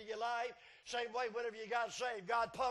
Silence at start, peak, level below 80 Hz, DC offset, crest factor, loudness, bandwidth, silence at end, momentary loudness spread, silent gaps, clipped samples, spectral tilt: 0 s; -24 dBFS; -74 dBFS; under 0.1%; 16 dB; -40 LUFS; 12 kHz; 0 s; 6 LU; none; under 0.1%; -2 dB/octave